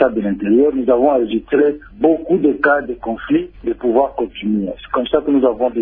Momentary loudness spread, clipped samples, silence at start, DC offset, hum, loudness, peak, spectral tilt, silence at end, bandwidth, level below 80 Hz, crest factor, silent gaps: 7 LU; under 0.1%; 0 s; under 0.1%; none; -16 LUFS; 0 dBFS; -10.5 dB/octave; 0 s; 4.2 kHz; -44 dBFS; 16 dB; none